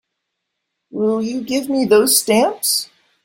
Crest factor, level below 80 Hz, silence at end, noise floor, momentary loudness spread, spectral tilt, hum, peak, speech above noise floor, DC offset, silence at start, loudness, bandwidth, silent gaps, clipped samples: 16 dB; -62 dBFS; 0.4 s; -76 dBFS; 9 LU; -2.5 dB/octave; none; -2 dBFS; 60 dB; under 0.1%; 0.95 s; -16 LUFS; 16.5 kHz; none; under 0.1%